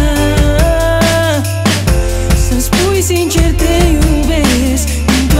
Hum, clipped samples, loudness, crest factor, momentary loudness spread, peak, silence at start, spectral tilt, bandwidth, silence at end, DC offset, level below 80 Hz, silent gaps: none; under 0.1%; -12 LUFS; 10 dB; 3 LU; 0 dBFS; 0 s; -5 dB/octave; 16.5 kHz; 0 s; under 0.1%; -14 dBFS; none